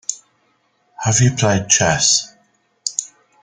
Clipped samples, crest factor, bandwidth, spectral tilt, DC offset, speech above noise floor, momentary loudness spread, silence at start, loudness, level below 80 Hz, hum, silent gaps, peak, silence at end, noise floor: under 0.1%; 18 dB; 10 kHz; -3 dB/octave; under 0.1%; 47 dB; 14 LU; 0.1 s; -16 LUFS; -50 dBFS; none; none; 0 dBFS; 0.35 s; -62 dBFS